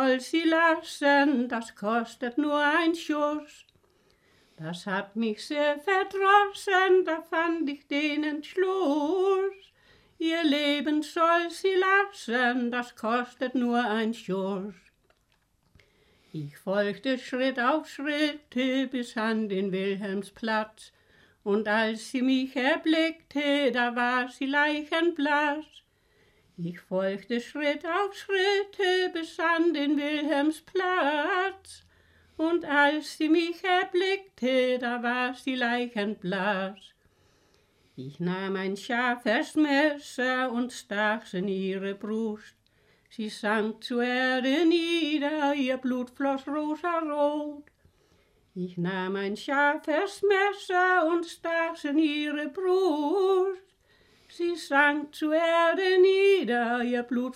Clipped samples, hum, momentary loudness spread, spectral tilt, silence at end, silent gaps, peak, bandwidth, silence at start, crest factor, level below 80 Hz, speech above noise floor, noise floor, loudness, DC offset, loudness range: under 0.1%; none; 9 LU; -5 dB/octave; 0 s; none; -8 dBFS; 14.5 kHz; 0 s; 18 dB; -72 dBFS; 43 dB; -70 dBFS; -27 LUFS; under 0.1%; 6 LU